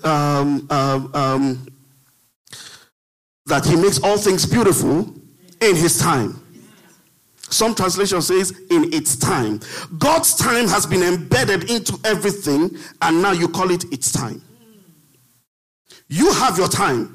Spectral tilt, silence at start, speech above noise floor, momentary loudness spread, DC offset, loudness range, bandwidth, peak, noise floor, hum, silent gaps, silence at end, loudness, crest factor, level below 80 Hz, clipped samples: -4 dB/octave; 0.05 s; 39 dB; 9 LU; under 0.1%; 5 LU; 15.5 kHz; 0 dBFS; -57 dBFS; none; 2.36-2.45 s, 2.92-3.45 s, 15.47-15.85 s; 0 s; -17 LUFS; 18 dB; -48 dBFS; under 0.1%